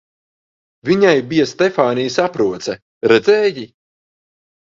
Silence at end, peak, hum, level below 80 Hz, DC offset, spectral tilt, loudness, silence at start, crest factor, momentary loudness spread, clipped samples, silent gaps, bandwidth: 1 s; 0 dBFS; none; -58 dBFS; under 0.1%; -5 dB/octave; -15 LUFS; 0.85 s; 16 dB; 14 LU; under 0.1%; 2.82-3.01 s; 7.6 kHz